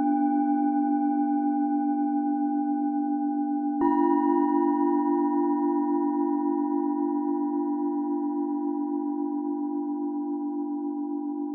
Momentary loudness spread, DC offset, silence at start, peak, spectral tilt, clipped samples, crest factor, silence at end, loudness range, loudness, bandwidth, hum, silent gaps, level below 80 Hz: 7 LU; under 0.1%; 0 s; -12 dBFS; -10.5 dB/octave; under 0.1%; 14 dB; 0 s; 5 LU; -26 LUFS; 2.4 kHz; none; none; -76 dBFS